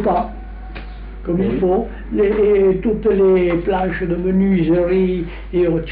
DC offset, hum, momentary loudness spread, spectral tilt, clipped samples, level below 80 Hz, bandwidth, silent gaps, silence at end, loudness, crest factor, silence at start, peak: under 0.1%; none; 18 LU; -7.5 dB/octave; under 0.1%; -32 dBFS; 4.6 kHz; none; 0 s; -17 LUFS; 10 dB; 0 s; -6 dBFS